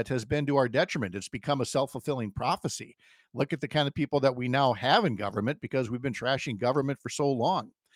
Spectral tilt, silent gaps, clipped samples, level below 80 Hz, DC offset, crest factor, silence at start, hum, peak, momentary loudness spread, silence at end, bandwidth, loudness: -5.5 dB/octave; none; under 0.1%; -62 dBFS; under 0.1%; 20 dB; 0 s; none; -8 dBFS; 8 LU; 0.25 s; 15.5 kHz; -29 LUFS